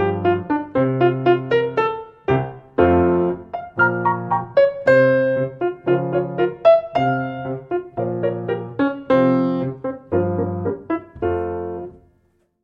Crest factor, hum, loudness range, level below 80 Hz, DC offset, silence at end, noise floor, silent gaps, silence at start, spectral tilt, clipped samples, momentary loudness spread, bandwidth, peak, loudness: 16 dB; none; 4 LU; -48 dBFS; under 0.1%; 0.7 s; -62 dBFS; none; 0 s; -9 dB/octave; under 0.1%; 11 LU; 5.8 kHz; -2 dBFS; -20 LUFS